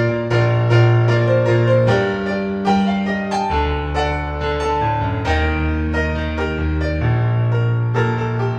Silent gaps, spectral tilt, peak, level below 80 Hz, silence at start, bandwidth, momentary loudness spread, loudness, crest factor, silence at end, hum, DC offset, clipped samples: none; -7.5 dB/octave; -2 dBFS; -28 dBFS; 0 s; 7.8 kHz; 6 LU; -18 LUFS; 14 dB; 0 s; none; under 0.1%; under 0.1%